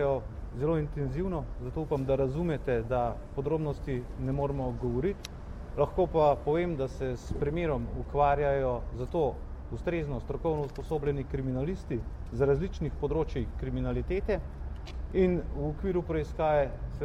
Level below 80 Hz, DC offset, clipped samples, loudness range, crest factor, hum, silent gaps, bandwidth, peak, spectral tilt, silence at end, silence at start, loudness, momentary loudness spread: -40 dBFS; under 0.1%; under 0.1%; 3 LU; 18 dB; none; none; 12.5 kHz; -14 dBFS; -8.5 dB/octave; 0 s; 0 s; -31 LUFS; 9 LU